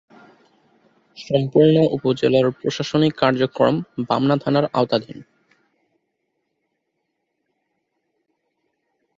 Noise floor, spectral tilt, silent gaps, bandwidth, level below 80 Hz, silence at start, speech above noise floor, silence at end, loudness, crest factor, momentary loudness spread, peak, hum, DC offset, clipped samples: -75 dBFS; -7 dB/octave; none; 7.8 kHz; -60 dBFS; 1.2 s; 57 dB; 3.95 s; -19 LUFS; 20 dB; 9 LU; -2 dBFS; none; under 0.1%; under 0.1%